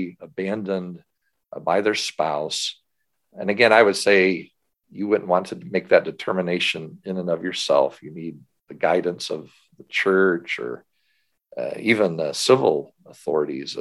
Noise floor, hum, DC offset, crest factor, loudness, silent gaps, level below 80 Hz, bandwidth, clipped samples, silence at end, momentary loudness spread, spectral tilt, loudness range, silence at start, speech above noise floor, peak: -77 dBFS; none; under 0.1%; 22 dB; -22 LUFS; none; -68 dBFS; 12.5 kHz; under 0.1%; 0 s; 15 LU; -4 dB/octave; 5 LU; 0 s; 56 dB; 0 dBFS